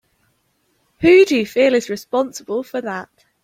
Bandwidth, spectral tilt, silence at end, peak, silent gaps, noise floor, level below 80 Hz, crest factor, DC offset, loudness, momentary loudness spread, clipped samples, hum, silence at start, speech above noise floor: 16 kHz; -4.5 dB/octave; 0.4 s; -2 dBFS; none; -65 dBFS; -54 dBFS; 16 dB; under 0.1%; -17 LUFS; 14 LU; under 0.1%; none; 1 s; 49 dB